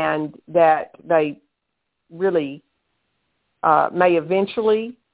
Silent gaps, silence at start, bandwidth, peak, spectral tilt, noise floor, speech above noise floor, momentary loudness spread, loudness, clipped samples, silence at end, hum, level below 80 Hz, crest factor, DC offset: none; 0 s; 4 kHz; -2 dBFS; -10 dB/octave; -77 dBFS; 58 dB; 8 LU; -20 LUFS; under 0.1%; 0.2 s; none; -64 dBFS; 18 dB; under 0.1%